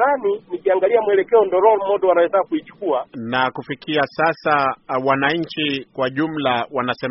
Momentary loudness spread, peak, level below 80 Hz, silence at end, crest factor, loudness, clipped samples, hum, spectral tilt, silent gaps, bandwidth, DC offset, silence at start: 7 LU; -2 dBFS; -60 dBFS; 0 s; 16 dB; -19 LUFS; under 0.1%; none; -3 dB/octave; none; 6 kHz; under 0.1%; 0 s